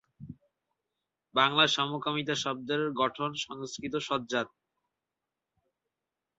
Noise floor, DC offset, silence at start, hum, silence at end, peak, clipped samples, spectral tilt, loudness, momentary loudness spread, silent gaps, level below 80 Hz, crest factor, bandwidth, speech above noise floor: -88 dBFS; under 0.1%; 0.2 s; none; 1.9 s; -8 dBFS; under 0.1%; -1.5 dB/octave; -29 LUFS; 15 LU; none; -70 dBFS; 26 dB; 8 kHz; 58 dB